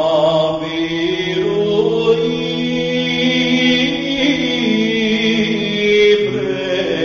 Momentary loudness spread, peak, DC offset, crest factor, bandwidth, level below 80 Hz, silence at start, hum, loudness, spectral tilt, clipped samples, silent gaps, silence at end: 6 LU; -2 dBFS; under 0.1%; 14 dB; 7.4 kHz; -48 dBFS; 0 s; none; -15 LUFS; -5 dB/octave; under 0.1%; none; 0 s